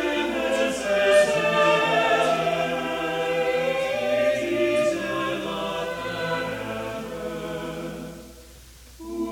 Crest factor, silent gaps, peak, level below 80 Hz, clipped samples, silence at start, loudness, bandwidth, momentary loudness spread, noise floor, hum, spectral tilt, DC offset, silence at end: 16 dB; none; -8 dBFS; -52 dBFS; under 0.1%; 0 s; -24 LUFS; 17.5 kHz; 13 LU; -46 dBFS; none; -4 dB/octave; under 0.1%; 0 s